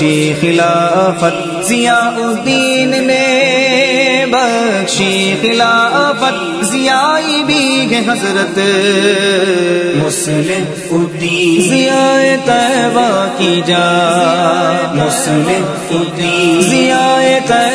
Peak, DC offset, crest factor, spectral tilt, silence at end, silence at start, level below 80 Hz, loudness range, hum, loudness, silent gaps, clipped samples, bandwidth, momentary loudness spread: 0 dBFS; under 0.1%; 12 dB; -4 dB/octave; 0 s; 0 s; -54 dBFS; 1 LU; none; -11 LUFS; none; under 0.1%; 11 kHz; 5 LU